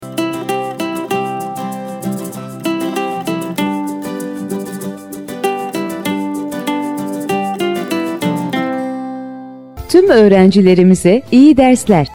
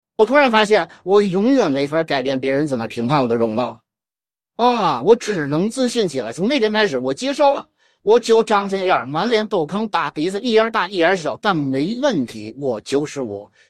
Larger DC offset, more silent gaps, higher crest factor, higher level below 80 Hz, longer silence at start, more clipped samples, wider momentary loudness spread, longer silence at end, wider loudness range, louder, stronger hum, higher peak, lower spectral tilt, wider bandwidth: second, under 0.1% vs 0.1%; neither; about the same, 14 dB vs 18 dB; first, -44 dBFS vs -64 dBFS; second, 0 s vs 0.2 s; neither; first, 16 LU vs 8 LU; second, 0 s vs 0.25 s; first, 10 LU vs 2 LU; first, -14 LUFS vs -18 LUFS; neither; about the same, 0 dBFS vs 0 dBFS; about the same, -6 dB/octave vs -5 dB/octave; first, over 20 kHz vs 12 kHz